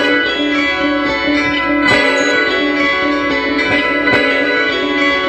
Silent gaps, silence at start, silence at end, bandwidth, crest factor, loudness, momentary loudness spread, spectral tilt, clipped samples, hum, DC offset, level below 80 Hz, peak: none; 0 s; 0 s; 8.8 kHz; 14 dB; -13 LUFS; 3 LU; -4 dB/octave; under 0.1%; none; under 0.1%; -40 dBFS; 0 dBFS